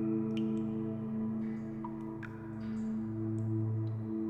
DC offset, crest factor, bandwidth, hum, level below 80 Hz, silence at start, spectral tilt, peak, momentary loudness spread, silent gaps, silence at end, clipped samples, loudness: under 0.1%; 12 dB; 7.6 kHz; none; -62 dBFS; 0 s; -10 dB/octave; -24 dBFS; 8 LU; none; 0 s; under 0.1%; -37 LUFS